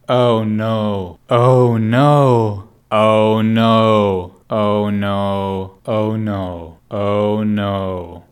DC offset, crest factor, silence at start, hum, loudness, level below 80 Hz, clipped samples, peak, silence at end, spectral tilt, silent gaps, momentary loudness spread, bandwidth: under 0.1%; 14 dB; 0.1 s; none; -16 LUFS; -56 dBFS; under 0.1%; 0 dBFS; 0.1 s; -8 dB/octave; none; 12 LU; 13.5 kHz